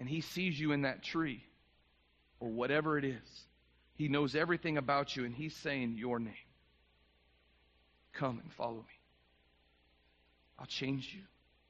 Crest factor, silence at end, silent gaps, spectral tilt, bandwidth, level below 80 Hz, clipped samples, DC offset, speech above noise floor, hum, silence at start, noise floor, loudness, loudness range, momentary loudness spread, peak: 22 dB; 0.45 s; none; -4.5 dB/octave; 7.6 kHz; -70 dBFS; under 0.1%; under 0.1%; 35 dB; 60 Hz at -65 dBFS; 0 s; -72 dBFS; -37 LUFS; 11 LU; 16 LU; -18 dBFS